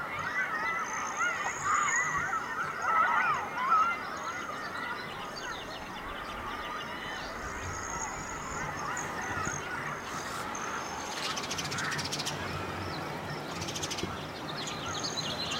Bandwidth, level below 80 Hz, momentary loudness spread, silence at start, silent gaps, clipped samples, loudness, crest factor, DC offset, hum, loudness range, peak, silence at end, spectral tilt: 16 kHz; -56 dBFS; 10 LU; 0 s; none; under 0.1%; -33 LUFS; 18 dB; under 0.1%; none; 8 LU; -16 dBFS; 0 s; -2.5 dB/octave